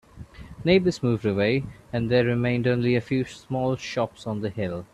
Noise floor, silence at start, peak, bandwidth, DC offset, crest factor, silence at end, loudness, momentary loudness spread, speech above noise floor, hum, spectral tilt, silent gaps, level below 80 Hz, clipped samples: -43 dBFS; 0.15 s; -6 dBFS; 11 kHz; under 0.1%; 18 dB; 0.1 s; -25 LUFS; 10 LU; 19 dB; none; -7 dB/octave; none; -52 dBFS; under 0.1%